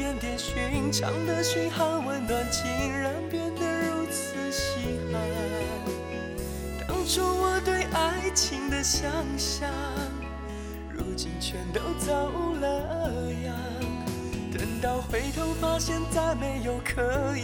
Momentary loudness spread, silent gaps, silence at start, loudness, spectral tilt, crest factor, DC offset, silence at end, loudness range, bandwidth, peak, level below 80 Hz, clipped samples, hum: 8 LU; none; 0 s; -29 LUFS; -4 dB/octave; 18 dB; under 0.1%; 0 s; 4 LU; 17.5 kHz; -12 dBFS; -38 dBFS; under 0.1%; none